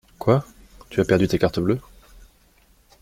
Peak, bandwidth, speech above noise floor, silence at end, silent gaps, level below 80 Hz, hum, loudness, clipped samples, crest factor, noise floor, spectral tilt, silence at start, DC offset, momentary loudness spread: -4 dBFS; 16.5 kHz; 37 dB; 1.2 s; none; -46 dBFS; none; -22 LUFS; under 0.1%; 20 dB; -57 dBFS; -7 dB/octave; 0.2 s; under 0.1%; 7 LU